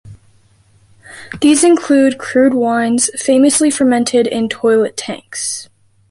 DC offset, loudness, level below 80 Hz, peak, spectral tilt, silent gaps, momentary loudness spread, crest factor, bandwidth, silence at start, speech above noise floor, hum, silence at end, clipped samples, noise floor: under 0.1%; -13 LUFS; -54 dBFS; -2 dBFS; -3 dB/octave; none; 11 LU; 12 dB; 11.5 kHz; 0.05 s; 38 dB; none; 0.45 s; under 0.1%; -51 dBFS